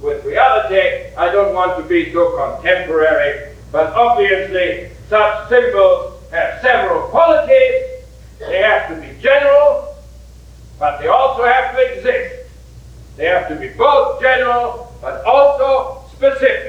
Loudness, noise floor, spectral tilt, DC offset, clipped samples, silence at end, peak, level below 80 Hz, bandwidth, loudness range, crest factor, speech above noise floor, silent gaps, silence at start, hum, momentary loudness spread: -14 LUFS; -38 dBFS; -5.5 dB/octave; under 0.1%; under 0.1%; 0 s; 0 dBFS; -40 dBFS; 8.6 kHz; 3 LU; 14 dB; 24 dB; none; 0 s; none; 11 LU